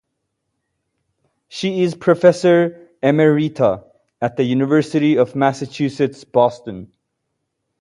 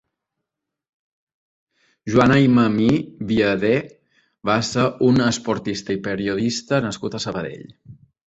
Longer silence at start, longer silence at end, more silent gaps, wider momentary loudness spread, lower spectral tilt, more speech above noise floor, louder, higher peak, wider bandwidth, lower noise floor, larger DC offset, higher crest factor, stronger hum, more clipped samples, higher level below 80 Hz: second, 1.55 s vs 2.05 s; first, 0.95 s vs 0.3 s; neither; about the same, 11 LU vs 12 LU; about the same, -7 dB/octave vs -6 dB/octave; second, 58 dB vs 64 dB; first, -17 LUFS vs -20 LUFS; about the same, 0 dBFS vs -2 dBFS; first, 11 kHz vs 8.2 kHz; second, -74 dBFS vs -83 dBFS; neither; about the same, 18 dB vs 18 dB; neither; neither; second, -60 dBFS vs -52 dBFS